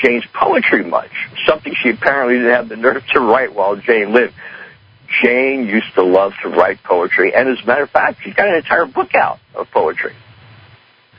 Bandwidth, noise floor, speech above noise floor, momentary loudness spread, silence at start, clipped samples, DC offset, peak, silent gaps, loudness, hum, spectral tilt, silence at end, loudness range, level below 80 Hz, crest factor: 5.4 kHz; -47 dBFS; 33 dB; 7 LU; 0 s; under 0.1%; under 0.1%; 0 dBFS; none; -14 LUFS; none; -7 dB/octave; 1.05 s; 1 LU; -54 dBFS; 14 dB